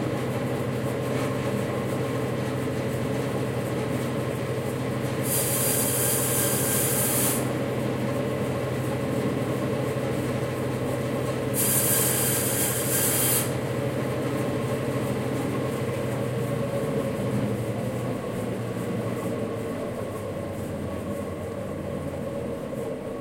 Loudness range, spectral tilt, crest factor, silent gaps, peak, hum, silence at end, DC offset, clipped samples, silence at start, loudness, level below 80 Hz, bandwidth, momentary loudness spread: 8 LU; -4.5 dB/octave; 18 dB; none; -8 dBFS; none; 0 s; under 0.1%; under 0.1%; 0 s; -26 LUFS; -54 dBFS; 16.5 kHz; 10 LU